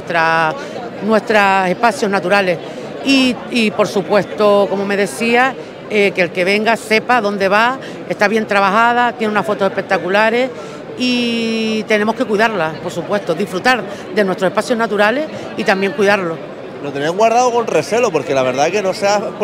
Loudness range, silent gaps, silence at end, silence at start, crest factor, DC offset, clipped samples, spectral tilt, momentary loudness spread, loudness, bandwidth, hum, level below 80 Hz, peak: 2 LU; none; 0 s; 0 s; 14 dB; under 0.1%; under 0.1%; -4.5 dB/octave; 8 LU; -15 LUFS; 16 kHz; none; -58 dBFS; 0 dBFS